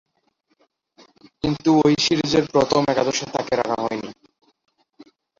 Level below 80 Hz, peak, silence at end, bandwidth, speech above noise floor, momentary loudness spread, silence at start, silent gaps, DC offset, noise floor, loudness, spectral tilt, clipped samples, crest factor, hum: -52 dBFS; -4 dBFS; 1.3 s; 7.6 kHz; 48 dB; 11 LU; 1.45 s; none; under 0.1%; -68 dBFS; -20 LUFS; -4.5 dB/octave; under 0.1%; 18 dB; none